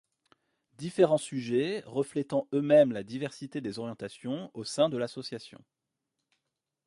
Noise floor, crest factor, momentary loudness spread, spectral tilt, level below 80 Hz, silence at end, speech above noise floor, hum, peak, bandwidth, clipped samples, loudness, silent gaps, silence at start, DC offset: -85 dBFS; 20 dB; 16 LU; -6 dB/octave; -74 dBFS; 1.4 s; 56 dB; none; -10 dBFS; 11.5 kHz; under 0.1%; -30 LUFS; none; 0.8 s; under 0.1%